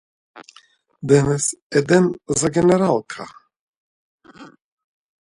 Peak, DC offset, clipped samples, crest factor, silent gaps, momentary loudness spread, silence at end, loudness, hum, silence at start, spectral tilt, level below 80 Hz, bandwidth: -2 dBFS; under 0.1%; under 0.1%; 20 dB; 1.62-1.70 s, 3.56-4.18 s; 18 LU; 0.75 s; -18 LUFS; none; 0.35 s; -5.5 dB/octave; -52 dBFS; 11.5 kHz